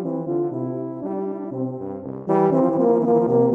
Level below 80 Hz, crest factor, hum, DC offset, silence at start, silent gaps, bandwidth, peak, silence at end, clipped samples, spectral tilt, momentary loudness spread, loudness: -64 dBFS; 14 dB; none; under 0.1%; 0 s; none; 3.1 kHz; -6 dBFS; 0 s; under 0.1%; -11.5 dB/octave; 11 LU; -22 LUFS